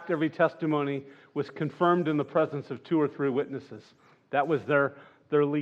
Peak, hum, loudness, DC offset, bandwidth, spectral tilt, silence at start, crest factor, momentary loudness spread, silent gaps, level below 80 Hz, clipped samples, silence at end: -10 dBFS; none; -28 LUFS; under 0.1%; 7.2 kHz; -8.5 dB/octave; 0 s; 18 dB; 12 LU; none; -84 dBFS; under 0.1%; 0 s